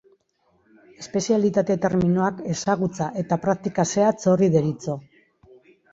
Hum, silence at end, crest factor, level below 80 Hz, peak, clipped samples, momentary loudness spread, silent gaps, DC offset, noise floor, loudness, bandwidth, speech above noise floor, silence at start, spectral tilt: none; 0.95 s; 18 dB; -56 dBFS; -6 dBFS; under 0.1%; 9 LU; none; under 0.1%; -66 dBFS; -22 LUFS; 7.8 kHz; 44 dB; 1 s; -6.5 dB/octave